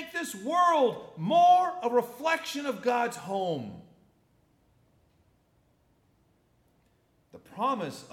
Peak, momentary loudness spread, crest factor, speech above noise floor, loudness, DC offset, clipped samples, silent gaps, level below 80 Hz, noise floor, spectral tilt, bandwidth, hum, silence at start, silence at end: -12 dBFS; 13 LU; 18 dB; 41 dB; -27 LUFS; under 0.1%; under 0.1%; none; -76 dBFS; -68 dBFS; -4.5 dB/octave; 16 kHz; none; 0 s; 0.05 s